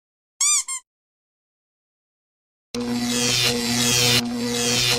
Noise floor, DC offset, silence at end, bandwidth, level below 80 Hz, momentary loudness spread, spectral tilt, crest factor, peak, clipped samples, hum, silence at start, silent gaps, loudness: under -90 dBFS; under 0.1%; 0 s; 16.5 kHz; -52 dBFS; 13 LU; -2 dB/octave; 16 dB; -6 dBFS; under 0.1%; 60 Hz at -40 dBFS; 0.4 s; 0.87-2.74 s; -19 LUFS